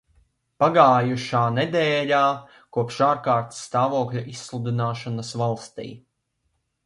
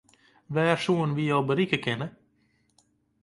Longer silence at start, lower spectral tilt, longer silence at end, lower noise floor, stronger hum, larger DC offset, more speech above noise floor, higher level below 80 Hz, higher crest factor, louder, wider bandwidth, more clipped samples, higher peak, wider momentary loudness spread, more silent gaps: about the same, 0.6 s vs 0.5 s; about the same, -6 dB/octave vs -6.5 dB/octave; second, 0.9 s vs 1.15 s; first, -74 dBFS vs -68 dBFS; neither; neither; first, 52 dB vs 43 dB; about the same, -64 dBFS vs -66 dBFS; about the same, 22 dB vs 20 dB; first, -22 LUFS vs -26 LUFS; about the same, 11.5 kHz vs 11.5 kHz; neither; first, -2 dBFS vs -8 dBFS; first, 15 LU vs 8 LU; neither